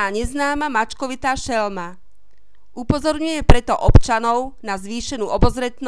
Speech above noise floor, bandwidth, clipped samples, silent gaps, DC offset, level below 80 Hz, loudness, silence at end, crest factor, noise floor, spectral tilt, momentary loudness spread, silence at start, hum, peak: 43 dB; 11 kHz; under 0.1%; none; 2%; -24 dBFS; -20 LUFS; 0 s; 18 dB; -60 dBFS; -5.5 dB/octave; 12 LU; 0 s; none; 0 dBFS